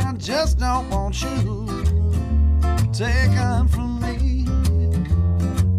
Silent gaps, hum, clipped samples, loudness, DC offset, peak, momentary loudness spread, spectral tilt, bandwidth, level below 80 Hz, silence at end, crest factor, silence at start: none; none; under 0.1%; -21 LUFS; under 0.1%; -8 dBFS; 5 LU; -6.5 dB/octave; 13.5 kHz; -22 dBFS; 0 s; 12 dB; 0 s